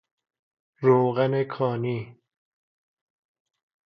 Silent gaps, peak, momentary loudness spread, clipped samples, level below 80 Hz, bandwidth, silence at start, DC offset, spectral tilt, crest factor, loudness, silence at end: none; -6 dBFS; 12 LU; under 0.1%; -72 dBFS; 5.4 kHz; 0.8 s; under 0.1%; -10 dB/octave; 22 dB; -24 LUFS; 1.75 s